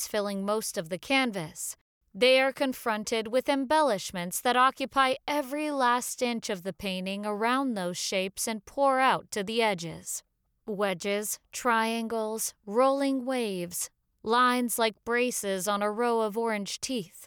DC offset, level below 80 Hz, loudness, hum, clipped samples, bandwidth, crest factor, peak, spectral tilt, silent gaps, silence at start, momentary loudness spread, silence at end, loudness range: under 0.1%; -66 dBFS; -28 LUFS; none; under 0.1%; over 20 kHz; 16 dB; -12 dBFS; -3 dB/octave; 1.81-2.01 s; 0 s; 10 LU; 0 s; 3 LU